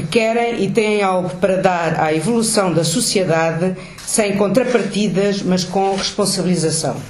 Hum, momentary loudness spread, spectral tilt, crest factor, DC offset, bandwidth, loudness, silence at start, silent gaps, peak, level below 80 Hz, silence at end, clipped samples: none; 3 LU; -4.5 dB/octave; 14 dB; under 0.1%; 14.5 kHz; -17 LUFS; 0 s; none; -2 dBFS; -48 dBFS; 0 s; under 0.1%